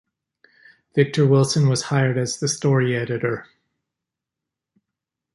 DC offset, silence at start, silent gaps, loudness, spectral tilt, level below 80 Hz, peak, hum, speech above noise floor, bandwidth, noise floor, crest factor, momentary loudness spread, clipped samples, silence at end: under 0.1%; 0.95 s; none; -20 LUFS; -5.5 dB/octave; -62 dBFS; -4 dBFS; none; 66 dB; 11.5 kHz; -85 dBFS; 18 dB; 8 LU; under 0.1%; 1.9 s